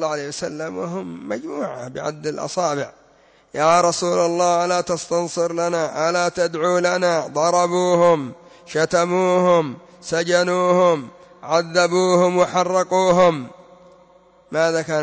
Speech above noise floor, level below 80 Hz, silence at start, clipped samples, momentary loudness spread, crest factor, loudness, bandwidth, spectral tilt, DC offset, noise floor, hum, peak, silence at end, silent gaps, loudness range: 35 dB; -62 dBFS; 0 s; under 0.1%; 12 LU; 14 dB; -19 LUFS; 8 kHz; -4.5 dB/octave; under 0.1%; -54 dBFS; none; -4 dBFS; 0 s; none; 4 LU